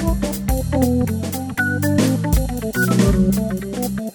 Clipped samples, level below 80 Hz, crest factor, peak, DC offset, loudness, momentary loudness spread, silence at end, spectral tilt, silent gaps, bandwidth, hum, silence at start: under 0.1%; -26 dBFS; 16 dB; -2 dBFS; under 0.1%; -19 LUFS; 8 LU; 0 s; -6 dB/octave; none; over 20 kHz; none; 0 s